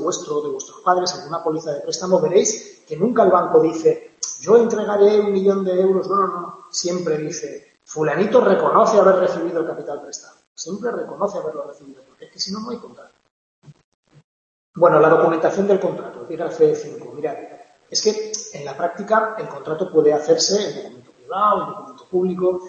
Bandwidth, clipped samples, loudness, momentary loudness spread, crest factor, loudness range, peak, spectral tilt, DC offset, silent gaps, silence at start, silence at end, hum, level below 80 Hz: 8.2 kHz; under 0.1%; -19 LUFS; 16 LU; 18 dB; 11 LU; -2 dBFS; -4.5 dB/octave; under 0.1%; 10.47-10.56 s, 13.31-13.62 s, 13.84-14.03 s, 14.24-14.74 s; 0 s; 0 s; none; -68 dBFS